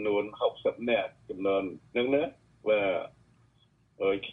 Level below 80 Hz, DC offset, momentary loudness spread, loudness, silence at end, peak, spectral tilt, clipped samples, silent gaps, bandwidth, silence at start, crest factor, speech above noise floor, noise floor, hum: -66 dBFS; under 0.1%; 9 LU; -30 LUFS; 0 s; -14 dBFS; -7 dB/octave; under 0.1%; none; 4 kHz; 0 s; 16 dB; 37 dB; -66 dBFS; none